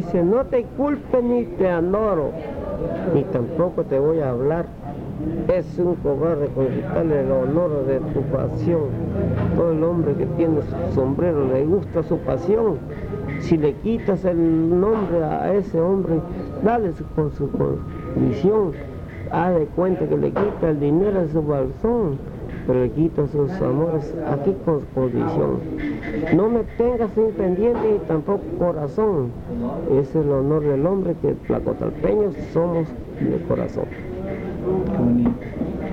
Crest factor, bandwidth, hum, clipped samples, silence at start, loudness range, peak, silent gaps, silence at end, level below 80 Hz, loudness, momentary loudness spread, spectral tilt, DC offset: 16 dB; 7.2 kHz; none; under 0.1%; 0 s; 2 LU; -4 dBFS; none; 0 s; -38 dBFS; -21 LUFS; 8 LU; -10 dB/octave; under 0.1%